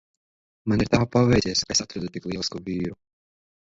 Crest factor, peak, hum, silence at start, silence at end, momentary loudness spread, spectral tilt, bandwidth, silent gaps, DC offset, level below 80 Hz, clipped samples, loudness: 24 dB; -2 dBFS; none; 0.65 s; 0.75 s; 13 LU; -4.5 dB/octave; 8 kHz; none; under 0.1%; -46 dBFS; under 0.1%; -24 LUFS